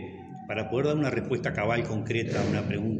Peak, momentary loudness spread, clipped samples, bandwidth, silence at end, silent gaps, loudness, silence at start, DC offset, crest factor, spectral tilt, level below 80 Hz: -14 dBFS; 7 LU; under 0.1%; 8.6 kHz; 0 s; none; -28 LUFS; 0 s; under 0.1%; 16 dB; -7 dB/octave; -54 dBFS